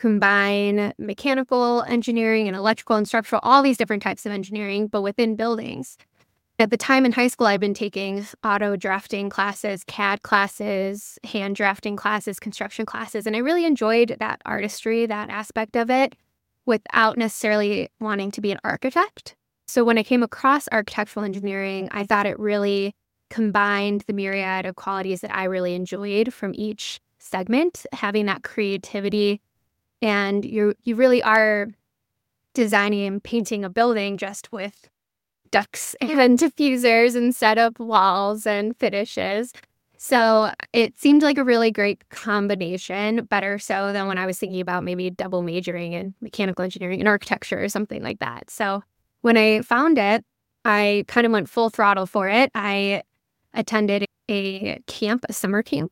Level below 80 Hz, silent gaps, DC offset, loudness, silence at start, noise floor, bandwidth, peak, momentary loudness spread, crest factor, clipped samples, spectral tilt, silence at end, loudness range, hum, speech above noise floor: -66 dBFS; none; under 0.1%; -22 LUFS; 0 s; -85 dBFS; 17 kHz; -2 dBFS; 11 LU; 20 dB; under 0.1%; -4.5 dB/octave; 0.05 s; 5 LU; none; 63 dB